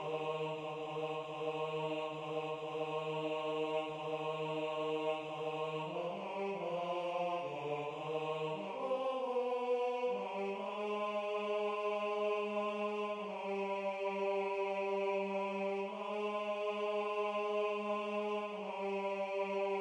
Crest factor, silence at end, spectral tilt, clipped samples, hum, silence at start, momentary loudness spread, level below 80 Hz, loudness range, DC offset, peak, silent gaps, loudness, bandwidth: 14 dB; 0 s; -5.5 dB/octave; under 0.1%; none; 0 s; 4 LU; -84 dBFS; 2 LU; under 0.1%; -24 dBFS; none; -38 LUFS; 10 kHz